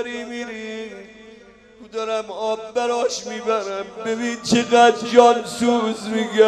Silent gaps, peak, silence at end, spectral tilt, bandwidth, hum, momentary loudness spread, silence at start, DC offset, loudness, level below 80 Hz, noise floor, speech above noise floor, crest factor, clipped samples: none; 0 dBFS; 0 s; -3.5 dB/octave; 12.5 kHz; none; 17 LU; 0 s; under 0.1%; -20 LUFS; -60 dBFS; -46 dBFS; 27 dB; 20 dB; under 0.1%